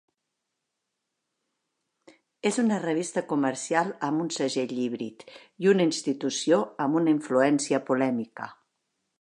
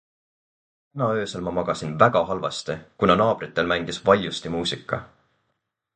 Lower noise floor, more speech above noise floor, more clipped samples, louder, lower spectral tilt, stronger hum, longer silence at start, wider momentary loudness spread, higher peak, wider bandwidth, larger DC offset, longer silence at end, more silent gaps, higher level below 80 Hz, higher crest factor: first, -83 dBFS vs -77 dBFS; about the same, 57 dB vs 54 dB; neither; second, -26 LUFS vs -23 LUFS; about the same, -4.5 dB/octave vs -5 dB/octave; neither; first, 2.45 s vs 0.95 s; second, 8 LU vs 11 LU; second, -8 dBFS vs -2 dBFS; first, 11 kHz vs 9.4 kHz; neither; second, 0.7 s vs 0.9 s; neither; second, -82 dBFS vs -52 dBFS; about the same, 20 dB vs 22 dB